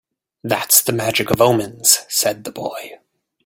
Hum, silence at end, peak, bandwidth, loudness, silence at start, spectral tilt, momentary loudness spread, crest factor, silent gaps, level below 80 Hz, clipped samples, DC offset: none; 0.5 s; 0 dBFS; 17 kHz; -15 LUFS; 0.45 s; -2.5 dB/octave; 15 LU; 18 dB; none; -56 dBFS; under 0.1%; under 0.1%